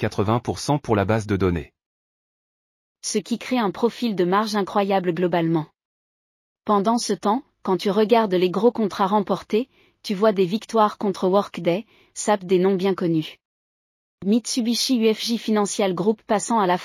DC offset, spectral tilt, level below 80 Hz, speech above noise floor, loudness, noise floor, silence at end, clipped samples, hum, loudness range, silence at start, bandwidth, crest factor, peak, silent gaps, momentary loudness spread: under 0.1%; -5 dB/octave; -54 dBFS; over 69 dB; -22 LUFS; under -90 dBFS; 0 s; under 0.1%; none; 4 LU; 0 s; 15.5 kHz; 18 dB; -4 dBFS; 1.86-2.95 s, 5.85-6.56 s, 13.45-14.18 s; 7 LU